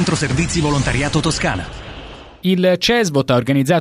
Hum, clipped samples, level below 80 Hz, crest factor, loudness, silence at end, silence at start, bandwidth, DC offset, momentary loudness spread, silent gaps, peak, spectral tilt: none; under 0.1%; -34 dBFS; 14 dB; -17 LUFS; 0 s; 0 s; 15.5 kHz; under 0.1%; 17 LU; none; -2 dBFS; -5 dB/octave